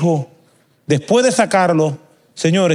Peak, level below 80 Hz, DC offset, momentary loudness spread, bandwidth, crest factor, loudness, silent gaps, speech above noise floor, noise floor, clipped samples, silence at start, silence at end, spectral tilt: -2 dBFS; -64 dBFS; under 0.1%; 20 LU; 12 kHz; 16 dB; -16 LUFS; none; 40 dB; -55 dBFS; under 0.1%; 0 s; 0 s; -5.5 dB/octave